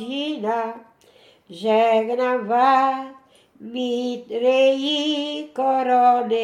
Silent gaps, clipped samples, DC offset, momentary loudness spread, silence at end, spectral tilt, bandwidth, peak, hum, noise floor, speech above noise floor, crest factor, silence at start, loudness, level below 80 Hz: none; under 0.1%; under 0.1%; 11 LU; 0 s; -4 dB/octave; 11.5 kHz; -4 dBFS; none; -53 dBFS; 33 dB; 16 dB; 0 s; -20 LUFS; -78 dBFS